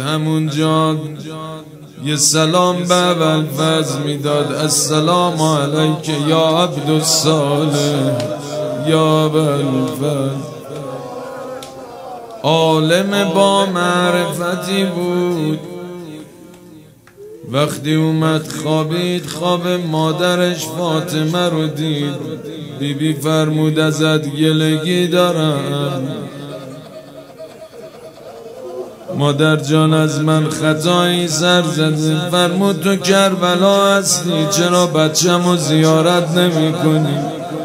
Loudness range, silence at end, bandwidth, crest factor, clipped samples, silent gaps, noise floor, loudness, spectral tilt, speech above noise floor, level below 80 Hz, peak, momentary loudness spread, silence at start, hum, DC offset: 7 LU; 0 s; 16 kHz; 16 dB; under 0.1%; none; -41 dBFS; -15 LUFS; -4.5 dB/octave; 27 dB; -58 dBFS; 0 dBFS; 17 LU; 0 s; none; under 0.1%